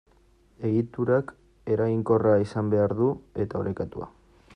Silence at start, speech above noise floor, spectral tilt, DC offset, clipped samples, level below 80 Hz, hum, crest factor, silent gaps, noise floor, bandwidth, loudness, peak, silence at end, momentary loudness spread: 0.6 s; 35 dB; -9.5 dB/octave; under 0.1%; under 0.1%; -56 dBFS; none; 16 dB; none; -60 dBFS; 9.8 kHz; -26 LUFS; -10 dBFS; 0.45 s; 14 LU